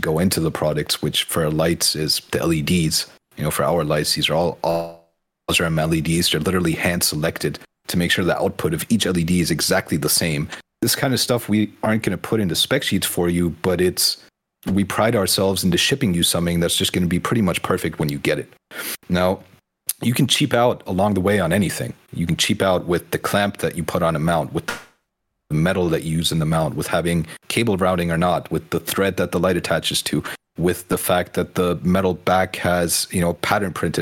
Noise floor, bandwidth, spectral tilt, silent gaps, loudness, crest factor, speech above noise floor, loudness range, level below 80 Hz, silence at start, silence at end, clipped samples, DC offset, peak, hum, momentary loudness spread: -75 dBFS; 17 kHz; -4.5 dB/octave; none; -20 LUFS; 18 dB; 55 dB; 3 LU; -48 dBFS; 0 s; 0 s; under 0.1%; under 0.1%; -2 dBFS; none; 7 LU